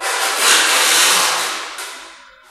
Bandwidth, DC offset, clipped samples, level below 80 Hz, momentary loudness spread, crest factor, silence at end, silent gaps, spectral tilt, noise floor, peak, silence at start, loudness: 16 kHz; under 0.1%; under 0.1%; -64 dBFS; 18 LU; 16 dB; 0.35 s; none; 2 dB/octave; -40 dBFS; 0 dBFS; 0 s; -12 LUFS